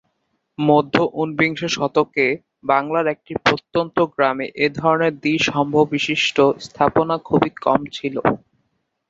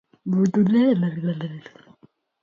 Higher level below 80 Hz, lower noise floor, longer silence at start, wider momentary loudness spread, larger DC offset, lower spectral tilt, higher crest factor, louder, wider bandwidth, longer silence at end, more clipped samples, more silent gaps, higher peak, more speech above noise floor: first, -54 dBFS vs -66 dBFS; first, -71 dBFS vs -58 dBFS; first, 0.6 s vs 0.25 s; second, 5 LU vs 15 LU; neither; second, -5 dB/octave vs -8.5 dB/octave; first, 20 dB vs 14 dB; about the same, -19 LUFS vs -21 LUFS; about the same, 7.8 kHz vs 7.2 kHz; about the same, 0.7 s vs 0.8 s; neither; neither; first, 0 dBFS vs -8 dBFS; first, 52 dB vs 37 dB